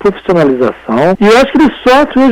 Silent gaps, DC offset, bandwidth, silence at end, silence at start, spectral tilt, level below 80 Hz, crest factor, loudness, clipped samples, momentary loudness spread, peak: none; under 0.1%; 16 kHz; 0 s; 0 s; -6 dB/octave; -36 dBFS; 6 dB; -8 LUFS; under 0.1%; 5 LU; -2 dBFS